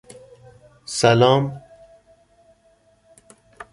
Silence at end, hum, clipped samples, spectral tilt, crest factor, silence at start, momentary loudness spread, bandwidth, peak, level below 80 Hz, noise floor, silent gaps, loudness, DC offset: 0.1 s; none; under 0.1%; -5 dB/octave; 22 dB; 0.9 s; 26 LU; 11.5 kHz; -2 dBFS; -58 dBFS; -59 dBFS; none; -18 LUFS; under 0.1%